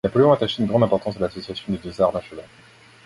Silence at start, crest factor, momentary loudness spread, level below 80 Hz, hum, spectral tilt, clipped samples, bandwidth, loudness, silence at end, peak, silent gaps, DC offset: 0.05 s; 18 dB; 15 LU; -50 dBFS; none; -7.5 dB/octave; under 0.1%; 11.5 kHz; -21 LUFS; 0.6 s; -2 dBFS; none; under 0.1%